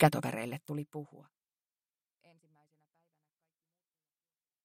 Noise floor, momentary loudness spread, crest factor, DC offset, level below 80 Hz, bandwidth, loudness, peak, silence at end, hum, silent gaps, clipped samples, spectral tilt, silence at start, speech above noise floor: under -90 dBFS; 15 LU; 28 dB; under 0.1%; -74 dBFS; 16 kHz; -36 LUFS; -10 dBFS; 3.45 s; none; none; under 0.1%; -6.5 dB/octave; 0 s; over 57 dB